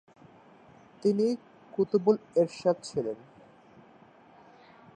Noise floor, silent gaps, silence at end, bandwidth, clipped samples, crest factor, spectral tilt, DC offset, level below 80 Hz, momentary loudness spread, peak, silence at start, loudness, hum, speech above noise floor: -56 dBFS; none; 1.8 s; 10 kHz; under 0.1%; 22 dB; -7 dB/octave; under 0.1%; -74 dBFS; 12 LU; -10 dBFS; 1.05 s; -29 LUFS; none; 29 dB